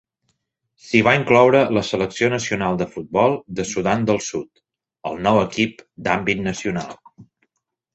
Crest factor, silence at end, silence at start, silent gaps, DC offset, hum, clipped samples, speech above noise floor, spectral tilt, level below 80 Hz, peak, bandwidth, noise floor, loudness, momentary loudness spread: 20 dB; 0.7 s; 0.85 s; none; under 0.1%; none; under 0.1%; 56 dB; -5 dB/octave; -52 dBFS; -2 dBFS; 8.2 kHz; -76 dBFS; -19 LUFS; 14 LU